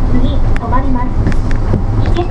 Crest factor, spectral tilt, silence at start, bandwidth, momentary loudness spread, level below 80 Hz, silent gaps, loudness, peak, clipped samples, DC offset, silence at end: 10 dB; -8.5 dB/octave; 0 s; 6 kHz; 2 LU; -12 dBFS; none; -16 LUFS; 0 dBFS; under 0.1%; under 0.1%; 0 s